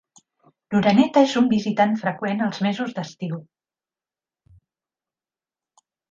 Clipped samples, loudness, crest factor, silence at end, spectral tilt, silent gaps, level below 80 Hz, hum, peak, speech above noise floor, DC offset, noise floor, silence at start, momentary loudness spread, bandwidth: under 0.1%; -21 LUFS; 20 dB; 2.65 s; -6.5 dB/octave; none; -62 dBFS; none; -4 dBFS; over 70 dB; under 0.1%; under -90 dBFS; 0.7 s; 14 LU; 7.6 kHz